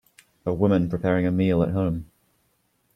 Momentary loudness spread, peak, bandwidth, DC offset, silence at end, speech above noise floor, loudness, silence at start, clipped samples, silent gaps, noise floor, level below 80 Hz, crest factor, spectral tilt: 9 LU; -8 dBFS; 9.2 kHz; under 0.1%; 0.9 s; 47 dB; -23 LUFS; 0.45 s; under 0.1%; none; -69 dBFS; -50 dBFS; 18 dB; -9.5 dB/octave